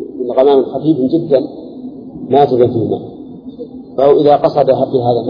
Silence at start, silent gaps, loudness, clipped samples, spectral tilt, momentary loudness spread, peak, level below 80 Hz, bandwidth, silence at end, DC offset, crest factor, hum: 0 s; none; -12 LUFS; under 0.1%; -10 dB/octave; 20 LU; 0 dBFS; -52 dBFS; 5.2 kHz; 0 s; under 0.1%; 12 dB; none